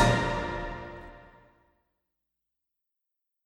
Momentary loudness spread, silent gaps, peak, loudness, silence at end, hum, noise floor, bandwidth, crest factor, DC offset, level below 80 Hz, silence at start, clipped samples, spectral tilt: 23 LU; none; -10 dBFS; -30 LUFS; 2.2 s; none; -85 dBFS; 12.5 kHz; 24 dB; under 0.1%; -44 dBFS; 0 s; under 0.1%; -5.5 dB/octave